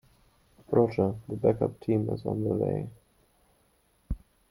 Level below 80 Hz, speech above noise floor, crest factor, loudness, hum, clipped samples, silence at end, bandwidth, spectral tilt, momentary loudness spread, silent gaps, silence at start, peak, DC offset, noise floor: -50 dBFS; 40 dB; 22 dB; -28 LUFS; none; under 0.1%; 0.35 s; 15.5 kHz; -10 dB/octave; 15 LU; none; 0.7 s; -10 dBFS; under 0.1%; -68 dBFS